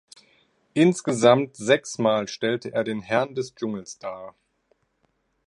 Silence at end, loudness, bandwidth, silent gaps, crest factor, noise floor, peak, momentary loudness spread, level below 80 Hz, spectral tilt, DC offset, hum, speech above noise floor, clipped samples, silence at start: 1.15 s; -23 LUFS; 11.5 kHz; none; 22 dB; -70 dBFS; -2 dBFS; 17 LU; -68 dBFS; -5 dB/octave; under 0.1%; none; 47 dB; under 0.1%; 0.75 s